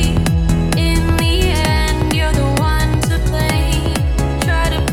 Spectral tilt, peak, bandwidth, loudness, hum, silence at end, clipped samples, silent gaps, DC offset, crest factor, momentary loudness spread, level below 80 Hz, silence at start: -5 dB/octave; -2 dBFS; 17.5 kHz; -16 LUFS; none; 0 s; under 0.1%; none; under 0.1%; 14 dB; 2 LU; -18 dBFS; 0 s